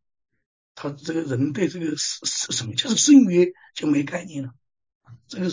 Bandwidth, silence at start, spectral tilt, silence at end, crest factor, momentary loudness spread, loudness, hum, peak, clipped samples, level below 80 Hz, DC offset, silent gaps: 7.6 kHz; 0.75 s; -4 dB/octave; 0 s; 18 dB; 20 LU; -21 LUFS; none; -4 dBFS; under 0.1%; -66 dBFS; under 0.1%; 4.95-5.01 s